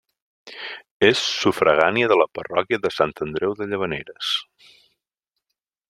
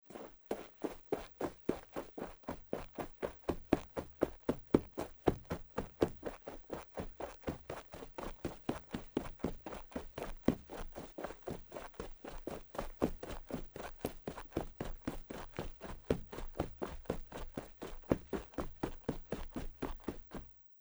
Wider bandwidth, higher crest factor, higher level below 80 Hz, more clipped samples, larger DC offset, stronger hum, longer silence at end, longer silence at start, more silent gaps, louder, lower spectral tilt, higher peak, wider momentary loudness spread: second, 13.5 kHz vs over 20 kHz; second, 22 dB vs 30 dB; second, -60 dBFS vs -52 dBFS; neither; neither; neither; first, 1.45 s vs 0 s; first, 0.45 s vs 0.05 s; first, 0.91-1.00 s vs none; first, -21 LUFS vs -43 LUFS; second, -4 dB/octave vs -6.5 dB/octave; first, 0 dBFS vs -12 dBFS; first, 16 LU vs 11 LU